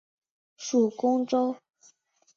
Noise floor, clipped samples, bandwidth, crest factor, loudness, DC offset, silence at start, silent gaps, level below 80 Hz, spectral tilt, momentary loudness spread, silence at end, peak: -63 dBFS; under 0.1%; 7.4 kHz; 16 dB; -26 LUFS; under 0.1%; 0.6 s; none; -78 dBFS; -5 dB/octave; 13 LU; 0.8 s; -12 dBFS